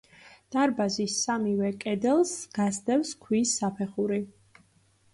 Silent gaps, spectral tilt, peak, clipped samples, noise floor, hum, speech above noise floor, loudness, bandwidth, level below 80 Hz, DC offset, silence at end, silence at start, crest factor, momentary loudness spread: none; -4 dB/octave; -14 dBFS; under 0.1%; -64 dBFS; none; 37 dB; -28 LUFS; 11.5 kHz; -68 dBFS; under 0.1%; 0.85 s; 0.25 s; 14 dB; 5 LU